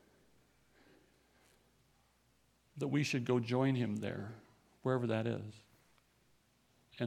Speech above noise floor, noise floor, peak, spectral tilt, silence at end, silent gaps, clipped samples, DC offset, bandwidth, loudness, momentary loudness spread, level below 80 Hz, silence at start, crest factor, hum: 38 dB; -73 dBFS; -20 dBFS; -6.5 dB/octave; 0 s; none; under 0.1%; under 0.1%; 13.5 kHz; -37 LUFS; 17 LU; -78 dBFS; 2.75 s; 20 dB; none